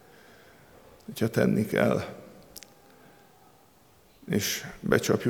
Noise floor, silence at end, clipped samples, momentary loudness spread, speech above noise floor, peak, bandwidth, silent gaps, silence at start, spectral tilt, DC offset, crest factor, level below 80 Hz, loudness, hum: -59 dBFS; 0 s; under 0.1%; 22 LU; 33 dB; -6 dBFS; 20 kHz; none; 1.1 s; -5 dB/octave; under 0.1%; 24 dB; -60 dBFS; -27 LUFS; none